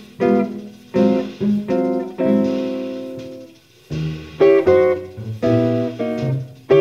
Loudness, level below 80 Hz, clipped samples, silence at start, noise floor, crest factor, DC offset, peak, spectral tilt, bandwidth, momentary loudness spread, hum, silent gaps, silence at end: -19 LUFS; -50 dBFS; under 0.1%; 0 s; -44 dBFS; 16 dB; under 0.1%; -2 dBFS; -8.5 dB/octave; 7.2 kHz; 16 LU; none; none; 0 s